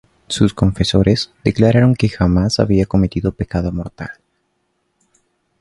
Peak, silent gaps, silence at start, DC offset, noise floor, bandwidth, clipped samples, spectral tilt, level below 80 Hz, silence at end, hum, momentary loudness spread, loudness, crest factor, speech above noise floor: 0 dBFS; none; 0.3 s; under 0.1%; -67 dBFS; 11.5 kHz; under 0.1%; -6.5 dB/octave; -32 dBFS; 1.5 s; none; 12 LU; -16 LUFS; 16 dB; 52 dB